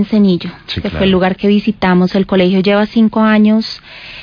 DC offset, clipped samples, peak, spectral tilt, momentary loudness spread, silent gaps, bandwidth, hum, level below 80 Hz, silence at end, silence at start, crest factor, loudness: under 0.1%; under 0.1%; -2 dBFS; -8 dB/octave; 11 LU; none; 5.2 kHz; none; -38 dBFS; 0 s; 0 s; 10 dB; -12 LUFS